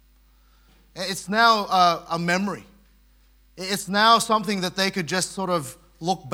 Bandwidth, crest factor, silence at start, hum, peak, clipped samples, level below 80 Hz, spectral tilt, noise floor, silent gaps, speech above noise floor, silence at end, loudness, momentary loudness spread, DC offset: 18 kHz; 20 dB; 0.95 s; none; -4 dBFS; under 0.1%; -58 dBFS; -3.5 dB/octave; -57 dBFS; none; 34 dB; 0 s; -22 LUFS; 14 LU; under 0.1%